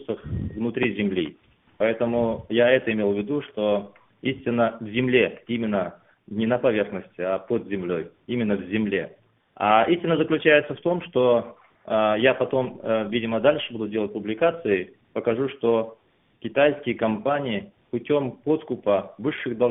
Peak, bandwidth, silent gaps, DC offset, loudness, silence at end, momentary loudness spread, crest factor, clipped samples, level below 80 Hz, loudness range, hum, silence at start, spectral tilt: -4 dBFS; 4 kHz; none; under 0.1%; -24 LUFS; 0 s; 10 LU; 20 dB; under 0.1%; -54 dBFS; 4 LU; none; 0 s; -10.5 dB/octave